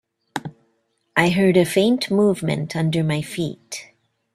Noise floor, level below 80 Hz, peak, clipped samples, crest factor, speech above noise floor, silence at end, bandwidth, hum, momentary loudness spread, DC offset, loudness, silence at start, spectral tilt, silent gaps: -68 dBFS; -58 dBFS; -2 dBFS; under 0.1%; 20 dB; 49 dB; 0.5 s; 14.5 kHz; none; 17 LU; under 0.1%; -20 LUFS; 0.35 s; -6 dB/octave; none